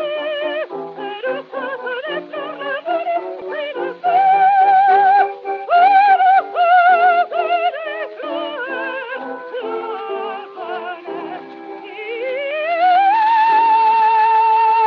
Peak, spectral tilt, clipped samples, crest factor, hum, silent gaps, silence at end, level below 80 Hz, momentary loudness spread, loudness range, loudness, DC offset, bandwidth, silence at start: -2 dBFS; 0.5 dB/octave; under 0.1%; 14 dB; none; none; 0 s; -84 dBFS; 16 LU; 13 LU; -16 LUFS; under 0.1%; 5.4 kHz; 0 s